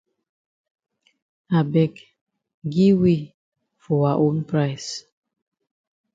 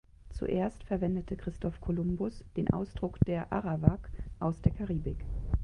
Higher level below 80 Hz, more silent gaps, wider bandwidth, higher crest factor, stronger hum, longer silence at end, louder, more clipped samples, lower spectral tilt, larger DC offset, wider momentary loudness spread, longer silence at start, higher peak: second, -60 dBFS vs -42 dBFS; first, 2.21-2.27 s, 2.54-2.62 s, 3.34-3.52 s vs none; second, 7.8 kHz vs 10 kHz; second, 18 dB vs 24 dB; neither; first, 1.15 s vs 0 s; first, -21 LUFS vs -33 LUFS; neither; second, -7.5 dB/octave vs -10 dB/octave; neither; first, 15 LU vs 9 LU; first, 1.5 s vs 0.2 s; about the same, -6 dBFS vs -8 dBFS